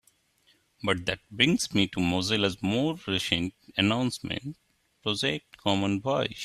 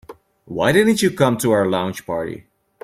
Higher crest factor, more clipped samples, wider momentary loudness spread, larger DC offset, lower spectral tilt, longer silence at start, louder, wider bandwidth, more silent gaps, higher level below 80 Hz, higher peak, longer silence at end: first, 24 dB vs 18 dB; neither; second, 9 LU vs 15 LU; neither; about the same, -4.5 dB/octave vs -5 dB/octave; first, 0.85 s vs 0.1 s; second, -27 LUFS vs -18 LUFS; second, 14 kHz vs 16 kHz; neither; about the same, -58 dBFS vs -54 dBFS; second, -6 dBFS vs -2 dBFS; second, 0 s vs 0.45 s